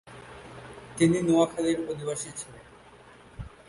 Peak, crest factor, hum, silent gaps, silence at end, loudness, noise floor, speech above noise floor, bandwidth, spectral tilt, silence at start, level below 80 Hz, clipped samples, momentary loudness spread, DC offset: -10 dBFS; 18 dB; none; none; 0.2 s; -26 LUFS; -52 dBFS; 26 dB; 11.5 kHz; -5.5 dB/octave; 0.05 s; -56 dBFS; under 0.1%; 22 LU; under 0.1%